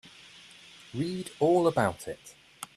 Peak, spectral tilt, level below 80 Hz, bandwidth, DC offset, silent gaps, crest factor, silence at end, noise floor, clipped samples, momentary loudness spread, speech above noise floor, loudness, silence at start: -10 dBFS; -6 dB/octave; -64 dBFS; 14 kHz; under 0.1%; none; 20 dB; 0.1 s; -52 dBFS; under 0.1%; 25 LU; 24 dB; -28 LUFS; 0.05 s